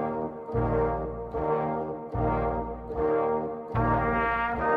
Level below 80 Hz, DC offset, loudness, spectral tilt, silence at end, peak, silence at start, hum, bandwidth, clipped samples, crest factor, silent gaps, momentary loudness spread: -40 dBFS; under 0.1%; -28 LUFS; -10 dB/octave; 0 s; -14 dBFS; 0 s; none; 5 kHz; under 0.1%; 14 dB; none; 8 LU